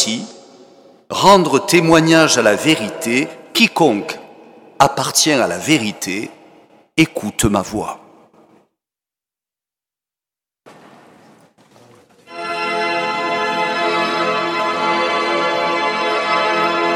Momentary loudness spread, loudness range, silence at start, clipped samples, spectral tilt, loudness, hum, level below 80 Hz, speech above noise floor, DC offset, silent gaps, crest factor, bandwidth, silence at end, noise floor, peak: 14 LU; 11 LU; 0 s; under 0.1%; -3.5 dB/octave; -15 LUFS; none; -48 dBFS; 75 dB; under 0.1%; none; 18 dB; 17.5 kHz; 0 s; -89 dBFS; 0 dBFS